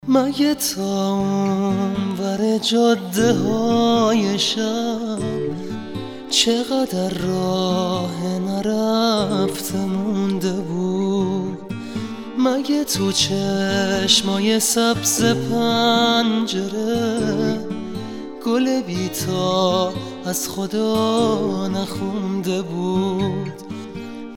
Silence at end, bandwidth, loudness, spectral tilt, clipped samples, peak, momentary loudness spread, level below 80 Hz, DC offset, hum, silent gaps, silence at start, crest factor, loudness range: 0 s; 18 kHz; -20 LUFS; -4.5 dB/octave; under 0.1%; -2 dBFS; 11 LU; -52 dBFS; under 0.1%; none; none; 0.05 s; 18 dB; 5 LU